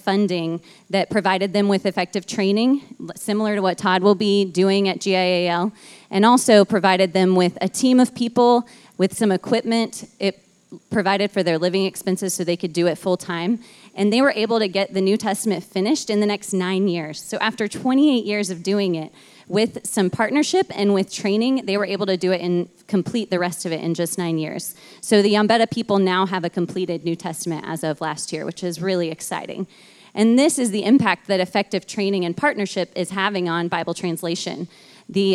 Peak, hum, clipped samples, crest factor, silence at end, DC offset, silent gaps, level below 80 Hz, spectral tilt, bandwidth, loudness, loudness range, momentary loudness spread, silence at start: -2 dBFS; none; under 0.1%; 18 dB; 0 s; under 0.1%; none; -68 dBFS; -5 dB/octave; 14.5 kHz; -20 LUFS; 5 LU; 10 LU; 0.05 s